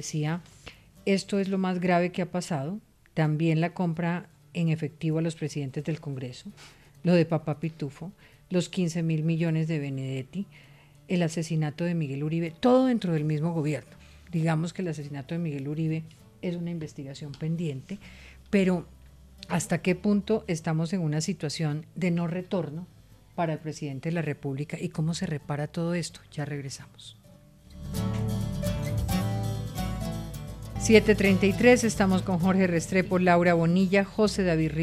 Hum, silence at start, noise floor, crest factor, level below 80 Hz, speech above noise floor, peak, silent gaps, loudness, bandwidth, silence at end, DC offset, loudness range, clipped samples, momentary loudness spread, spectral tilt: none; 0 s; -53 dBFS; 22 dB; -48 dBFS; 27 dB; -6 dBFS; none; -28 LUFS; 14.5 kHz; 0 s; under 0.1%; 9 LU; under 0.1%; 15 LU; -6.5 dB/octave